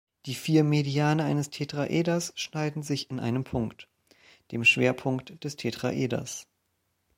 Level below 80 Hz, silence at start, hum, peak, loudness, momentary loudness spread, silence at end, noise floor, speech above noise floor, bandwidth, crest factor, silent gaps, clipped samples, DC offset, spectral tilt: -60 dBFS; 0.25 s; none; -8 dBFS; -27 LUFS; 12 LU; 0.75 s; -76 dBFS; 48 dB; 16.5 kHz; 20 dB; none; under 0.1%; under 0.1%; -5 dB/octave